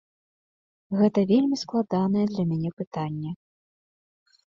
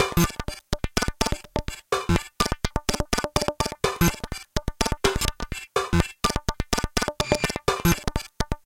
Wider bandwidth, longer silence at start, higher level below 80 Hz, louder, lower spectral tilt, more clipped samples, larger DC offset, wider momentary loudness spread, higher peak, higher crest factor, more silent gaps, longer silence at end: second, 7.4 kHz vs 17 kHz; first, 0.9 s vs 0 s; second, -66 dBFS vs -32 dBFS; about the same, -25 LUFS vs -26 LUFS; first, -7.5 dB/octave vs -4 dB/octave; neither; neither; first, 11 LU vs 8 LU; second, -8 dBFS vs 0 dBFS; second, 18 dB vs 24 dB; first, 2.73-2.77 s, 2.87-2.91 s vs none; first, 1.15 s vs 0.1 s